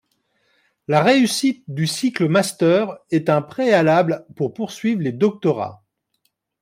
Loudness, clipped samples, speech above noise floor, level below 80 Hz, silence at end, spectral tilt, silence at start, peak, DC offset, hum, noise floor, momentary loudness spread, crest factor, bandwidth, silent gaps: -19 LUFS; under 0.1%; 52 dB; -66 dBFS; 0.85 s; -5.5 dB/octave; 0.9 s; -4 dBFS; under 0.1%; none; -70 dBFS; 10 LU; 16 dB; 16 kHz; none